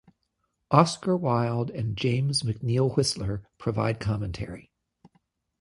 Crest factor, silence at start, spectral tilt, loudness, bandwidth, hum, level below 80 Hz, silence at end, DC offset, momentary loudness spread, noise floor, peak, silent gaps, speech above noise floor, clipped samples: 24 dB; 0.7 s; -6 dB/octave; -26 LUFS; 11.5 kHz; none; -50 dBFS; 1 s; under 0.1%; 12 LU; -77 dBFS; -4 dBFS; none; 51 dB; under 0.1%